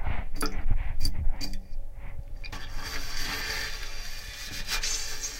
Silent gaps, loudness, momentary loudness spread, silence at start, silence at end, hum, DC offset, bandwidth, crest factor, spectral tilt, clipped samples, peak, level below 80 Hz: none; -34 LUFS; 13 LU; 0 s; 0 s; none; under 0.1%; 16.5 kHz; 16 dB; -2 dB/octave; under 0.1%; -10 dBFS; -30 dBFS